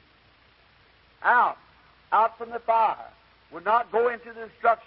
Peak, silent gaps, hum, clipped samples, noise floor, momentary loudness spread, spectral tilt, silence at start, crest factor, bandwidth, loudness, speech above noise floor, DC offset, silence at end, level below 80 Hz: -8 dBFS; none; none; under 0.1%; -59 dBFS; 16 LU; -7.5 dB/octave; 1.2 s; 18 dB; 5.6 kHz; -24 LUFS; 35 dB; under 0.1%; 0.1 s; -66 dBFS